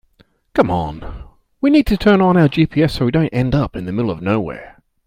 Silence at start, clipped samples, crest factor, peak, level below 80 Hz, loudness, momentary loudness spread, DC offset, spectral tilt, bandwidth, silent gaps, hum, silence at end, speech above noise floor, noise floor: 0.55 s; under 0.1%; 16 dB; 0 dBFS; -34 dBFS; -16 LUFS; 14 LU; under 0.1%; -8 dB/octave; 16 kHz; none; none; 0.4 s; 40 dB; -55 dBFS